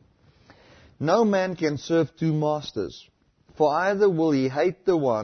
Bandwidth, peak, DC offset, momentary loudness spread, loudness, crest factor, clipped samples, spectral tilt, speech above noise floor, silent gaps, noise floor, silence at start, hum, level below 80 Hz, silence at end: 6.6 kHz; -8 dBFS; under 0.1%; 9 LU; -24 LUFS; 16 dB; under 0.1%; -7 dB/octave; 35 dB; none; -57 dBFS; 1 s; none; -62 dBFS; 0 s